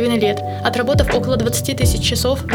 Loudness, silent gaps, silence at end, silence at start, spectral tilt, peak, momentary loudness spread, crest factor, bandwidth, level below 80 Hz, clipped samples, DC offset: -17 LUFS; none; 0 s; 0 s; -4.5 dB/octave; -2 dBFS; 3 LU; 14 dB; over 20 kHz; -28 dBFS; under 0.1%; under 0.1%